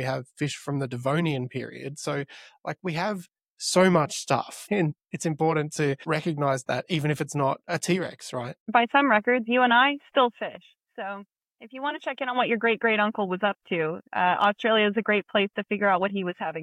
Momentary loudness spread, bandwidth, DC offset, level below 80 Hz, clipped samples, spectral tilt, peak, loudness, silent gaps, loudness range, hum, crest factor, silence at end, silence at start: 14 LU; 15 kHz; under 0.1%; -70 dBFS; under 0.1%; -5 dB/octave; -6 dBFS; -25 LUFS; 3.50-3.56 s, 8.60-8.66 s; 4 LU; none; 20 dB; 0 s; 0 s